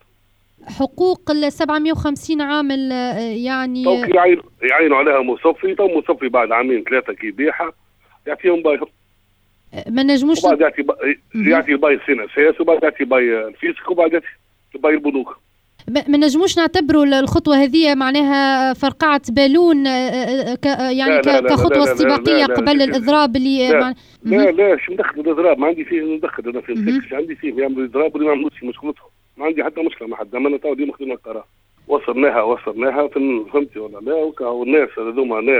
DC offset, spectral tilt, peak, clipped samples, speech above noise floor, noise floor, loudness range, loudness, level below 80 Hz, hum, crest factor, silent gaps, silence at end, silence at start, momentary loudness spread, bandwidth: under 0.1%; -5 dB/octave; -2 dBFS; under 0.1%; 43 dB; -58 dBFS; 7 LU; -16 LUFS; -48 dBFS; none; 14 dB; none; 0 s; 0.65 s; 10 LU; 13.5 kHz